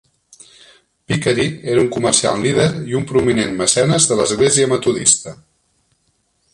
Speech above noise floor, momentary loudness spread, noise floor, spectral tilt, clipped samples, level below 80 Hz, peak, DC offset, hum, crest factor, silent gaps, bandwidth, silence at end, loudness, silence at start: 48 dB; 5 LU; -64 dBFS; -3.5 dB/octave; under 0.1%; -48 dBFS; 0 dBFS; under 0.1%; none; 18 dB; none; 11.5 kHz; 1.2 s; -15 LUFS; 1.1 s